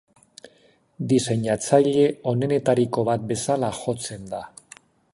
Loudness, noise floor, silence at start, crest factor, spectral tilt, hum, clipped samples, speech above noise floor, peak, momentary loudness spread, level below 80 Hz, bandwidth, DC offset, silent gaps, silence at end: -22 LUFS; -59 dBFS; 1 s; 20 dB; -6 dB/octave; none; under 0.1%; 37 dB; -4 dBFS; 15 LU; -58 dBFS; 11.5 kHz; under 0.1%; none; 0.65 s